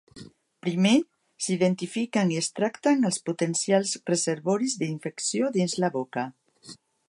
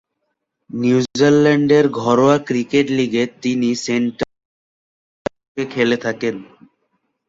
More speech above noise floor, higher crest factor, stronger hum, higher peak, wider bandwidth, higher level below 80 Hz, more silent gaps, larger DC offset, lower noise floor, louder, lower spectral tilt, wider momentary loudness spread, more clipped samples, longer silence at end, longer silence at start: second, 24 dB vs 58 dB; about the same, 18 dB vs 16 dB; neither; second, -10 dBFS vs -2 dBFS; first, 11.5 kHz vs 7.8 kHz; second, -74 dBFS vs -56 dBFS; second, none vs 4.45-5.25 s, 5.48-5.55 s; neither; second, -50 dBFS vs -74 dBFS; second, -26 LUFS vs -17 LUFS; about the same, -4.5 dB/octave vs -5.5 dB/octave; second, 8 LU vs 15 LU; neither; second, 0.35 s vs 0.85 s; second, 0.15 s vs 0.75 s